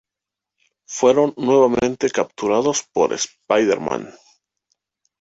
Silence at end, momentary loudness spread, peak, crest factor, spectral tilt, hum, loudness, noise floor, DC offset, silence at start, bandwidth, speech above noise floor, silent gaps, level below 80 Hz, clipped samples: 1.1 s; 10 LU; -2 dBFS; 18 dB; -4 dB/octave; none; -19 LUFS; -86 dBFS; under 0.1%; 0.9 s; 8 kHz; 68 dB; none; -56 dBFS; under 0.1%